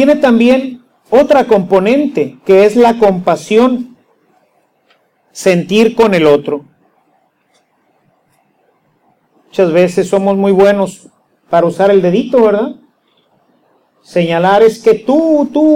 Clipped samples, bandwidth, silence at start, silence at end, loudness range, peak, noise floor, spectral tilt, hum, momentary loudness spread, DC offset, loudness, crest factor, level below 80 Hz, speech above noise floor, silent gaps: under 0.1%; 15.5 kHz; 0 s; 0 s; 6 LU; 0 dBFS; -57 dBFS; -6.5 dB/octave; none; 8 LU; under 0.1%; -10 LUFS; 12 dB; -50 dBFS; 48 dB; none